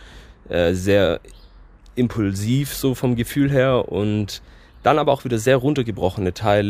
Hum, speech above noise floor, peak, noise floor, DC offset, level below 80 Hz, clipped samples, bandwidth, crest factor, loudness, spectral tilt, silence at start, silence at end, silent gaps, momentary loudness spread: none; 26 dB; -2 dBFS; -46 dBFS; under 0.1%; -42 dBFS; under 0.1%; 16 kHz; 18 dB; -20 LUFS; -6 dB/octave; 0 s; 0 s; none; 7 LU